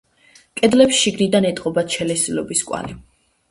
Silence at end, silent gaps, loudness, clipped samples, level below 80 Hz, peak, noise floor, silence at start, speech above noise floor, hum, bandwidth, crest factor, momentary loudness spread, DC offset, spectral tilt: 0.5 s; none; -18 LUFS; under 0.1%; -52 dBFS; 0 dBFS; -52 dBFS; 0.55 s; 35 dB; none; 11.5 kHz; 18 dB; 14 LU; under 0.1%; -3.5 dB/octave